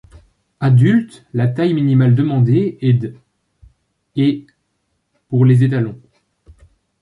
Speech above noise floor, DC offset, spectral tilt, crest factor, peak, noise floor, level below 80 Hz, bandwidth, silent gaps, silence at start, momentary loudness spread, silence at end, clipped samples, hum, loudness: 55 dB; under 0.1%; -9.5 dB/octave; 14 dB; -2 dBFS; -68 dBFS; -52 dBFS; 4.6 kHz; none; 0.6 s; 12 LU; 1.05 s; under 0.1%; none; -15 LUFS